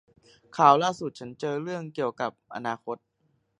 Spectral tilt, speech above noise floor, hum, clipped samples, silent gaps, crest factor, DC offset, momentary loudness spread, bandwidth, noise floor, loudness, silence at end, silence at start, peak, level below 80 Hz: -5 dB/octave; 45 dB; none; under 0.1%; none; 24 dB; under 0.1%; 18 LU; 10 kHz; -72 dBFS; -27 LUFS; 0.65 s; 0.55 s; -4 dBFS; -74 dBFS